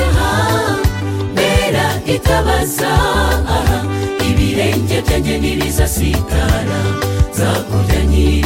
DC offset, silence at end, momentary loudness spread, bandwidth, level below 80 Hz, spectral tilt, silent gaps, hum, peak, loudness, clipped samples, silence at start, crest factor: under 0.1%; 0 s; 4 LU; 17 kHz; -20 dBFS; -5 dB/octave; none; none; 0 dBFS; -15 LUFS; under 0.1%; 0 s; 14 dB